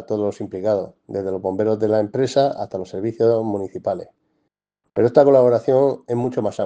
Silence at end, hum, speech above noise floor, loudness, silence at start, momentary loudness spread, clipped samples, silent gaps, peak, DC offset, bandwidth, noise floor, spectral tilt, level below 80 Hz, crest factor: 0 s; none; 55 dB; -20 LUFS; 0 s; 13 LU; under 0.1%; none; 0 dBFS; under 0.1%; 9.2 kHz; -74 dBFS; -7.5 dB/octave; -64 dBFS; 20 dB